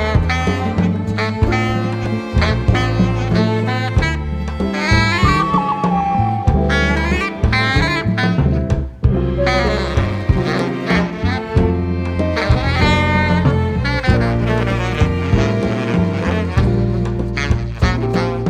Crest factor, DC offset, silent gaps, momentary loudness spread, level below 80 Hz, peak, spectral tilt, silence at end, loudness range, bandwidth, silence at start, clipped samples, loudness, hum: 14 dB; under 0.1%; none; 5 LU; -24 dBFS; 0 dBFS; -7 dB/octave; 0 s; 2 LU; 10 kHz; 0 s; under 0.1%; -17 LUFS; none